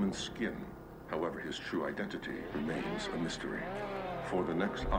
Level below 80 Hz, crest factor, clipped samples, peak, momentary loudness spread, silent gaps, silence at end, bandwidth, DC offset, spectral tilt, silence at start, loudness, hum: -50 dBFS; 18 dB; under 0.1%; -18 dBFS; 6 LU; none; 0 s; 16 kHz; under 0.1%; -5 dB/octave; 0 s; -38 LUFS; none